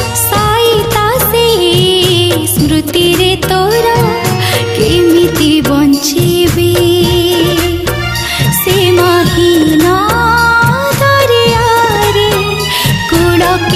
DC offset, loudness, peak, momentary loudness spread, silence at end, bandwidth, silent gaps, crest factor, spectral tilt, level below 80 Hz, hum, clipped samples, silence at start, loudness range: under 0.1%; -9 LUFS; 0 dBFS; 3 LU; 0 s; 16 kHz; none; 8 dB; -4.5 dB/octave; -28 dBFS; none; under 0.1%; 0 s; 1 LU